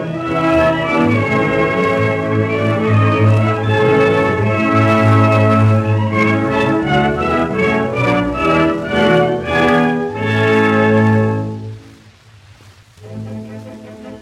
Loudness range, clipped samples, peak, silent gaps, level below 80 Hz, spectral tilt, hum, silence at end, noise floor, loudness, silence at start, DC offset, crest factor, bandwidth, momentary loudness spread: 4 LU; under 0.1%; 0 dBFS; none; -42 dBFS; -7.5 dB/octave; none; 0 s; -43 dBFS; -14 LUFS; 0 s; under 0.1%; 14 dB; 10 kHz; 14 LU